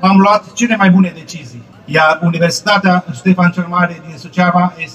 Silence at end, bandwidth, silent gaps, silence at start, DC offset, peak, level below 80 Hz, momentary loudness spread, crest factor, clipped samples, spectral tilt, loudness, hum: 0 s; 11 kHz; none; 0 s; under 0.1%; 0 dBFS; -54 dBFS; 11 LU; 12 dB; under 0.1%; -6 dB/octave; -12 LUFS; none